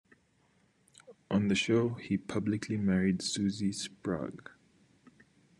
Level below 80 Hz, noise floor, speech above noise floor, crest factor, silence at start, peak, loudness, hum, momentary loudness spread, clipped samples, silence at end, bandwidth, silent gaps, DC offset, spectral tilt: -68 dBFS; -70 dBFS; 38 dB; 18 dB; 1.1 s; -16 dBFS; -32 LUFS; none; 9 LU; under 0.1%; 1.25 s; 11.5 kHz; none; under 0.1%; -5.5 dB/octave